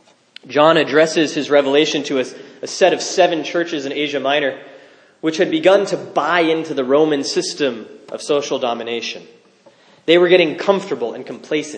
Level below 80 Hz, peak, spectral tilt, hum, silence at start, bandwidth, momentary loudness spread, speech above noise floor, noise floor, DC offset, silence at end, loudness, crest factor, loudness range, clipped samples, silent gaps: -74 dBFS; 0 dBFS; -4 dB/octave; none; 0.45 s; 10 kHz; 14 LU; 33 dB; -50 dBFS; under 0.1%; 0 s; -17 LUFS; 18 dB; 3 LU; under 0.1%; none